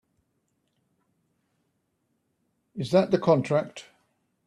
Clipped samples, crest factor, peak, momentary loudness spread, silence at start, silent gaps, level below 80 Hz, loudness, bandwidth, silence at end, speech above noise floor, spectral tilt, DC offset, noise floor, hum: under 0.1%; 22 dB; -8 dBFS; 20 LU; 2.75 s; none; -68 dBFS; -24 LUFS; 11.5 kHz; 0.65 s; 52 dB; -7 dB/octave; under 0.1%; -75 dBFS; none